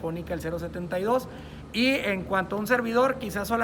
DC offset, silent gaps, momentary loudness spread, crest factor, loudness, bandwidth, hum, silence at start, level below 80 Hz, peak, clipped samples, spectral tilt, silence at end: under 0.1%; none; 9 LU; 16 dB; -27 LUFS; 20 kHz; none; 0 s; -50 dBFS; -10 dBFS; under 0.1%; -5 dB/octave; 0 s